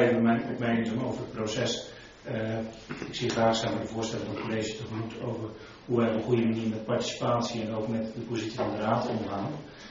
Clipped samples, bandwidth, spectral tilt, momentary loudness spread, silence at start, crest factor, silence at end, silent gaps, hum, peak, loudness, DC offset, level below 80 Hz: under 0.1%; 7.4 kHz; -5 dB/octave; 11 LU; 0 s; 18 dB; 0 s; none; none; -10 dBFS; -30 LUFS; under 0.1%; -58 dBFS